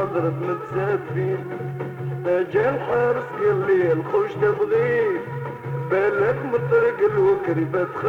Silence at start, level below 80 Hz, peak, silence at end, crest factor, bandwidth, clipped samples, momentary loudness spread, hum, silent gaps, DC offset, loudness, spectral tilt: 0 s; -56 dBFS; -8 dBFS; 0 s; 14 dB; 6.8 kHz; under 0.1%; 10 LU; none; none; under 0.1%; -22 LUFS; -9 dB/octave